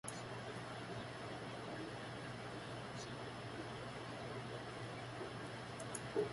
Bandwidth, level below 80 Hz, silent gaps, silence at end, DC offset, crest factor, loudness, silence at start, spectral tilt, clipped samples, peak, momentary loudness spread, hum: 11.5 kHz; -68 dBFS; none; 0 s; under 0.1%; 20 dB; -48 LUFS; 0.05 s; -4.5 dB/octave; under 0.1%; -26 dBFS; 1 LU; none